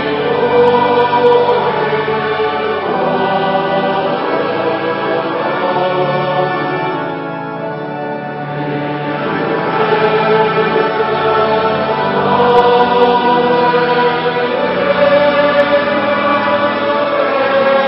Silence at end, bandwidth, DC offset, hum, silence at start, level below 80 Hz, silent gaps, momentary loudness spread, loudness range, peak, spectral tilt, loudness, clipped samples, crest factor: 0 s; 5.8 kHz; under 0.1%; none; 0 s; -52 dBFS; none; 8 LU; 6 LU; 0 dBFS; -8 dB/octave; -13 LUFS; under 0.1%; 14 dB